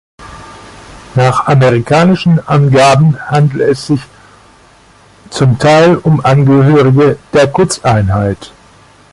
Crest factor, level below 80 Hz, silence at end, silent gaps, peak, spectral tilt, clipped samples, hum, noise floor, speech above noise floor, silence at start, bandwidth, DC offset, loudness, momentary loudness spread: 10 dB; -36 dBFS; 0.65 s; none; 0 dBFS; -6.5 dB/octave; under 0.1%; none; -42 dBFS; 34 dB; 0.2 s; 11.5 kHz; under 0.1%; -9 LUFS; 9 LU